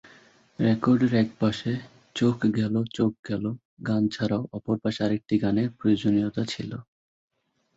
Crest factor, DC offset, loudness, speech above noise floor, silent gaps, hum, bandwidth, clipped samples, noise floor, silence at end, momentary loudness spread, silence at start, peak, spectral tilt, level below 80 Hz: 16 dB; under 0.1%; -26 LUFS; 31 dB; 3.19-3.23 s, 3.65-3.77 s; none; 8 kHz; under 0.1%; -55 dBFS; 0.95 s; 11 LU; 0.6 s; -10 dBFS; -7 dB/octave; -58 dBFS